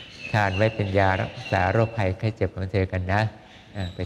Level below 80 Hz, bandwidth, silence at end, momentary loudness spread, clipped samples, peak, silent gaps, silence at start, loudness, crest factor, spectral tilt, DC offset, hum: -52 dBFS; 9.2 kHz; 0 s; 8 LU; under 0.1%; -6 dBFS; none; 0 s; -24 LUFS; 18 dB; -7 dB/octave; under 0.1%; none